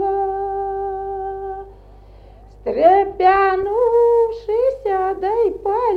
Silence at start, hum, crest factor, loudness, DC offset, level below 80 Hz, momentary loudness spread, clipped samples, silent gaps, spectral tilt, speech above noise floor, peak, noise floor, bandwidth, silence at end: 0 s; none; 16 dB; -18 LUFS; under 0.1%; -44 dBFS; 13 LU; under 0.1%; none; -7 dB/octave; 26 dB; -2 dBFS; -42 dBFS; 5.4 kHz; 0 s